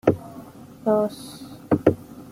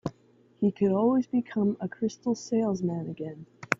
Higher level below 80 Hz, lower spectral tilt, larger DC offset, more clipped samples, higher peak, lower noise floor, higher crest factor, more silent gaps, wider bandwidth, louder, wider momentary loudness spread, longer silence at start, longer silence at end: first, -56 dBFS vs -68 dBFS; about the same, -7.5 dB/octave vs -7 dB/octave; neither; neither; about the same, -2 dBFS vs -4 dBFS; second, -42 dBFS vs -61 dBFS; about the same, 24 dB vs 24 dB; neither; first, 16 kHz vs 7.6 kHz; first, -24 LUFS vs -28 LUFS; first, 20 LU vs 14 LU; about the same, 0.05 s vs 0.05 s; about the same, 0.05 s vs 0.05 s